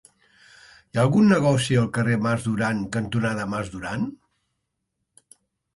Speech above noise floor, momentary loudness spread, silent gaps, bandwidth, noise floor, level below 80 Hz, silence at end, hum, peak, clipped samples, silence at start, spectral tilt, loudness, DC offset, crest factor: 57 dB; 12 LU; none; 11.5 kHz; -78 dBFS; -54 dBFS; 1.6 s; none; -6 dBFS; under 0.1%; 0.95 s; -6.5 dB/octave; -23 LUFS; under 0.1%; 18 dB